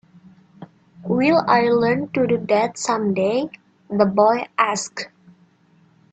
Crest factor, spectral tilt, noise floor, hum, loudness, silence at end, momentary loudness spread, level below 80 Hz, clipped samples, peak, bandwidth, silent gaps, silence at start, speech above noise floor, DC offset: 18 dB; -5 dB/octave; -56 dBFS; none; -19 LUFS; 1.05 s; 13 LU; -62 dBFS; under 0.1%; -2 dBFS; 9.2 kHz; none; 0.6 s; 38 dB; under 0.1%